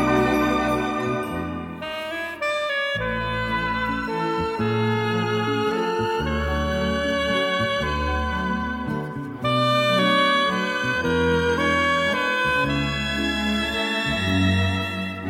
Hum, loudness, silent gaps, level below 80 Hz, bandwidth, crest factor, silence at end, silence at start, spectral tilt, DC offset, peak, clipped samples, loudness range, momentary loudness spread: none; -22 LUFS; none; -38 dBFS; 16.5 kHz; 16 dB; 0 s; 0 s; -5.5 dB/octave; under 0.1%; -6 dBFS; under 0.1%; 5 LU; 8 LU